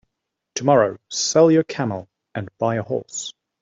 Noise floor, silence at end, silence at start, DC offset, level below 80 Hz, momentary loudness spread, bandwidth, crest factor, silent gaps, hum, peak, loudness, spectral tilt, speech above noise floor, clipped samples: -79 dBFS; 0.3 s; 0.55 s; under 0.1%; -64 dBFS; 17 LU; 8 kHz; 18 dB; none; none; -4 dBFS; -20 LUFS; -4.5 dB/octave; 60 dB; under 0.1%